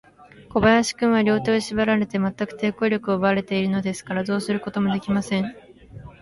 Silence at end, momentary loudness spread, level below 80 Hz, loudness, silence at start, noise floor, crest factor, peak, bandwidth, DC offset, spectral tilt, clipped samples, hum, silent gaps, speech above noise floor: 0.1 s; 8 LU; -50 dBFS; -22 LUFS; 0.4 s; -47 dBFS; 18 dB; -4 dBFS; 11.5 kHz; under 0.1%; -5.5 dB/octave; under 0.1%; none; none; 25 dB